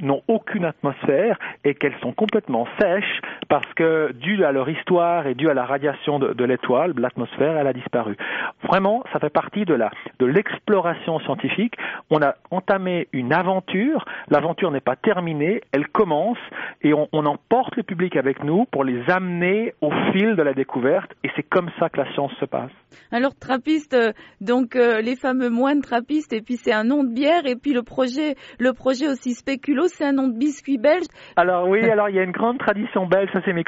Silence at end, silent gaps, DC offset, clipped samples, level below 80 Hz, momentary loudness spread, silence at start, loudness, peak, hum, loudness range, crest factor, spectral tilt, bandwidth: 0.05 s; none; under 0.1%; under 0.1%; -62 dBFS; 6 LU; 0 s; -21 LUFS; -4 dBFS; none; 2 LU; 16 dB; -4.5 dB/octave; 8 kHz